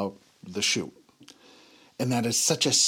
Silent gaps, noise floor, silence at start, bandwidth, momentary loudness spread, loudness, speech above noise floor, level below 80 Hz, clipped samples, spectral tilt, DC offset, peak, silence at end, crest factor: none; -55 dBFS; 0 s; 19 kHz; 15 LU; -25 LUFS; 30 dB; -74 dBFS; under 0.1%; -2.5 dB/octave; under 0.1%; -10 dBFS; 0 s; 20 dB